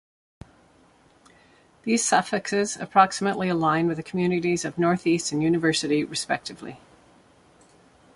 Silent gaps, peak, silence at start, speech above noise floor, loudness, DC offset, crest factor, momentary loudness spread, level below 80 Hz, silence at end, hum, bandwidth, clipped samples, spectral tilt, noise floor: none; -4 dBFS; 1.85 s; 34 dB; -23 LUFS; under 0.1%; 22 dB; 8 LU; -62 dBFS; 1.4 s; none; 11.5 kHz; under 0.1%; -4.5 dB/octave; -58 dBFS